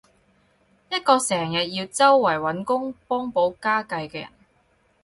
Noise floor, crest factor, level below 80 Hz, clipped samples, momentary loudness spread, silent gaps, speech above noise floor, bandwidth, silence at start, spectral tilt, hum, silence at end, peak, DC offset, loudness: -64 dBFS; 20 dB; -64 dBFS; under 0.1%; 13 LU; none; 42 dB; 11.5 kHz; 0.9 s; -3.5 dB/octave; none; 0.75 s; -4 dBFS; under 0.1%; -22 LUFS